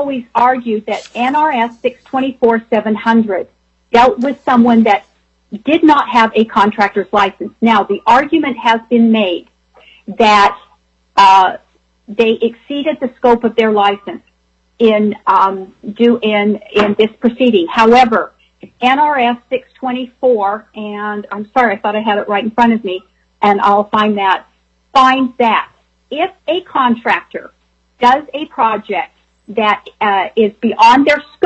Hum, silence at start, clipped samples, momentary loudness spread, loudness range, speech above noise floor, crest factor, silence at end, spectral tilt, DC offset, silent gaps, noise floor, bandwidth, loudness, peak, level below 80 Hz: none; 0 s; under 0.1%; 12 LU; 4 LU; 46 dB; 12 dB; 0 s; -5.5 dB/octave; under 0.1%; none; -58 dBFS; 8.2 kHz; -12 LUFS; 0 dBFS; -52 dBFS